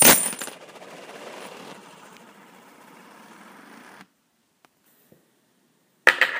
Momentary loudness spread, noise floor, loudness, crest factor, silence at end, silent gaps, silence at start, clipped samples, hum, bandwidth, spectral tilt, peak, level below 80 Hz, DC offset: 29 LU; -68 dBFS; -19 LUFS; 26 dB; 0 s; none; 0 s; under 0.1%; none; 16 kHz; -0.5 dB/octave; 0 dBFS; -68 dBFS; under 0.1%